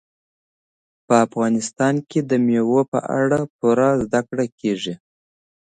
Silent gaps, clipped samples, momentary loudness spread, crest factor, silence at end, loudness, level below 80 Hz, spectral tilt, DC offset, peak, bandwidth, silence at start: 2.88-2.92 s, 3.50-3.59 s, 4.52-4.58 s; under 0.1%; 7 LU; 18 dB; 0.7 s; -20 LUFS; -58 dBFS; -6 dB/octave; under 0.1%; -2 dBFS; 9.4 kHz; 1.1 s